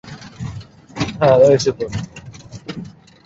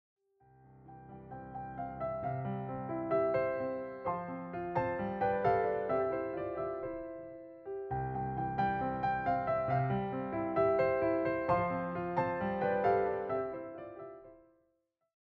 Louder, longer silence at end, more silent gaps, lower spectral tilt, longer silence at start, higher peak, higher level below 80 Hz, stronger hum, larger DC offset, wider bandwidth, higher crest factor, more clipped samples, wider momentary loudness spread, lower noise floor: first, -16 LUFS vs -34 LUFS; second, 0.35 s vs 0.8 s; neither; second, -6 dB/octave vs -10 dB/octave; second, 0.05 s vs 0.7 s; first, 0 dBFS vs -18 dBFS; first, -44 dBFS vs -60 dBFS; neither; neither; first, 8 kHz vs 5.8 kHz; about the same, 18 dB vs 18 dB; neither; first, 25 LU vs 15 LU; second, -37 dBFS vs -79 dBFS